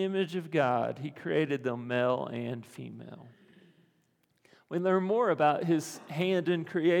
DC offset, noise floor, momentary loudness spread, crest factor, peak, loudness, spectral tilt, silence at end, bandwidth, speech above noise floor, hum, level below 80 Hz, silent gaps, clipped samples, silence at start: under 0.1%; -72 dBFS; 14 LU; 18 dB; -12 dBFS; -30 LUFS; -6.5 dB/octave; 0 s; 18 kHz; 43 dB; none; -84 dBFS; none; under 0.1%; 0 s